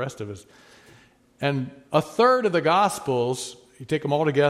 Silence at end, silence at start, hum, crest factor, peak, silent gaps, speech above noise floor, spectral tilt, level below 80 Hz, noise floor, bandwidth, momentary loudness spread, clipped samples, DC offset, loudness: 0 s; 0 s; none; 20 dB; -4 dBFS; none; 32 dB; -5.5 dB/octave; -64 dBFS; -55 dBFS; 15.5 kHz; 17 LU; under 0.1%; under 0.1%; -23 LUFS